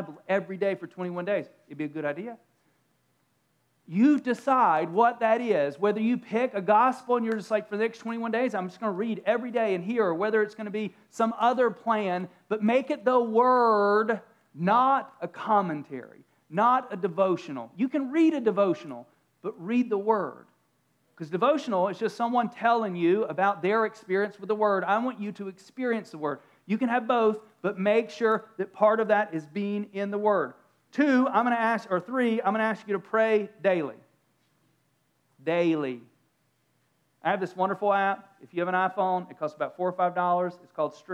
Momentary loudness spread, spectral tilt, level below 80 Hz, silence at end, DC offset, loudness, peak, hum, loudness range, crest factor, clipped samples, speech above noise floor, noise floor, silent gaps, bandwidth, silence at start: 12 LU; -7 dB/octave; under -90 dBFS; 0 s; under 0.1%; -27 LUFS; -8 dBFS; none; 5 LU; 18 dB; under 0.1%; 45 dB; -71 dBFS; none; 11.5 kHz; 0 s